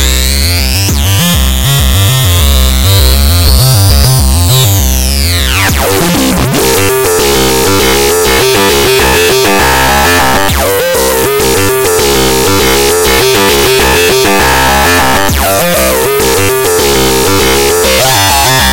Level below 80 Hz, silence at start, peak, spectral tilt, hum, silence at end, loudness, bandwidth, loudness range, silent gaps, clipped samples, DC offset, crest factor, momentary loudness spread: -16 dBFS; 0 s; 0 dBFS; -3.5 dB/octave; none; 0 s; -7 LUFS; 17.5 kHz; 1 LU; none; under 0.1%; under 0.1%; 8 dB; 3 LU